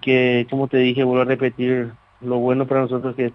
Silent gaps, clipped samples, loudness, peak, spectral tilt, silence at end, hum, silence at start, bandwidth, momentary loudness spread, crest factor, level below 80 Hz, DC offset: none; under 0.1%; -19 LUFS; -4 dBFS; -9 dB/octave; 0 s; none; 0 s; 5.6 kHz; 7 LU; 14 dB; -60 dBFS; under 0.1%